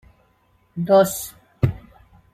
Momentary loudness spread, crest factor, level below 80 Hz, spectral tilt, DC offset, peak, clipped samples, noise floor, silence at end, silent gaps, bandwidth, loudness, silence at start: 20 LU; 20 dB; -46 dBFS; -6 dB/octave; under 0.1%; -4 dBFS; under 0.1%; -61 dBFS; 0.55 s; none; 15.5 kHz; -20 LUFS; 0.75 s